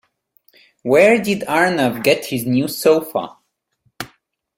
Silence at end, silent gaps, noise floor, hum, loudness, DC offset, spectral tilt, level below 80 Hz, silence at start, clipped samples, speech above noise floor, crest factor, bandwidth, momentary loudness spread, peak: 0.5 s; none; -67 dBFS; none; -16 LUFS; under 0.1%; -5 dB/octave; -58 dBFS; 0.85 s; under 0.1%; 51 dB; 18 dB; 16.5 kHz; 20 LU; 0 dBFS